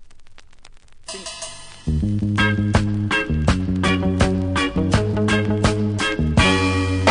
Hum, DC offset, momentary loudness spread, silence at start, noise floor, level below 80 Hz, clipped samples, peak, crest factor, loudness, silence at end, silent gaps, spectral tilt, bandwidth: none; under 0.1%; 14 LU; 0 s; -42 dBFS; -30 dBFS; under 0.1%; -2 dBFS; 18 dB; -19 LUFS; 0 s; none; -5.5 dB/octave; 10.5 kHz